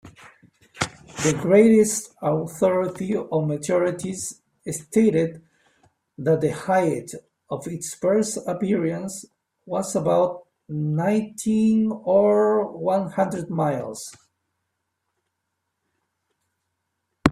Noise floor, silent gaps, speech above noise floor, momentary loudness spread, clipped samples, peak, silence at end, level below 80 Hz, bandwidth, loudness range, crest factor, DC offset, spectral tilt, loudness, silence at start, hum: -79 dBFS; none; 57 dB; 14 LU; under 0.1%; 0 dBFS; 0 s; -60 dBFS; 15.5 kHz; 6 LU; 24 dB; under 0.1%; -6 dB/octave; -22 LUFS; 0.05 s; none